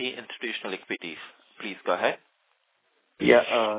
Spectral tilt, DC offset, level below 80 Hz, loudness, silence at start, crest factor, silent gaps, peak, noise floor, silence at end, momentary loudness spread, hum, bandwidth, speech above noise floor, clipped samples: -8 dB/octave; under 0.1%; -66 dBFS; -26 LUFS; 0 s; 24 dB; none; -2 dBFS; -71 dBFS; 0 s; 19 LU; none; 4 kHz; 46 dB; under 0.1%